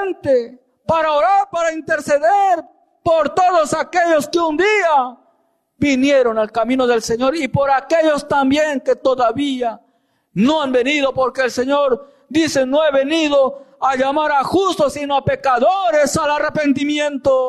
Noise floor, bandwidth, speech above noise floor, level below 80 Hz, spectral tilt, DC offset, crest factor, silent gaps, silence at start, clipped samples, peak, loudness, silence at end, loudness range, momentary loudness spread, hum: -62 dBFS; 13 kHz; 46 dB; -52 dBFS; -4.5 dB/octave; under 0.1%; 10 dB; none; 0 s; under 0.1%; -6 dBFS; -16 LUFS; 0 s; 2 LU; 5 LU; none